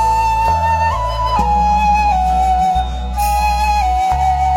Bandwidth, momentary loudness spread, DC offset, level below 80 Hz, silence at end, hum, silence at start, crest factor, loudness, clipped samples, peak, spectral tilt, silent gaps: 16.5 kHz; 4 LU; under 0.1%; -22 dBFS; 0 s; none; 0 s; 12 dB; -15 LUFS; under 0.1%; -2 dBFS; -5 dB/octave; none